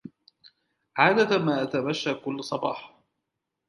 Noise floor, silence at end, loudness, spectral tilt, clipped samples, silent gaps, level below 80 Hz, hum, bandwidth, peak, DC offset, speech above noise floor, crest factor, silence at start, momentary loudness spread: -83 dBFS; 0.8 s; -25 LUFS; -5.5 dB/octave; under 0.1%; none; -72 dBFS; none; 11.5 kHz; -4 dBFS; under 0.1%; 58 dB; 24 dB; 0.05 s; 11 LU